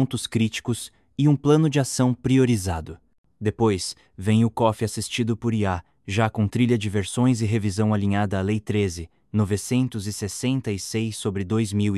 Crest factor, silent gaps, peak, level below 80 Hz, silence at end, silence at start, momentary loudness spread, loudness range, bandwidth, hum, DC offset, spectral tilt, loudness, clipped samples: 16 dB; 3.18-3.24 s; -6 dBFS; -44 dBFS; 0 s; 0 s; 10 LU; 3 LU; 13 kHz; none; under 0.1%; -6 dB/octave; -23 LUFS; under 0.1%